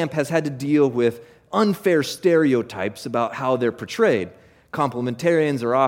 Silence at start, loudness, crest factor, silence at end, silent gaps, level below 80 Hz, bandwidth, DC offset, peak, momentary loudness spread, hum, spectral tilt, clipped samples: 0 s; -21 LUFS; 16 dB; 0 s; none; -64 dBFS; 17 kHz; under 0.1%; -6 dBFS; 7 LU; none; -6 dB/octave; under 0.1%